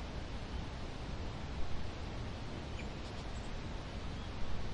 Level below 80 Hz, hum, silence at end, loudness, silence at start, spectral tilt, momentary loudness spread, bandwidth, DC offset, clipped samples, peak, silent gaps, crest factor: -46 dBFS; none; 0 s; -45 LUFS; 0 s; -5.5 dB/octave; 1 LU; 10.5 kHz; 0.1%; under 0.1%; -24 dBFS; none; 14 dB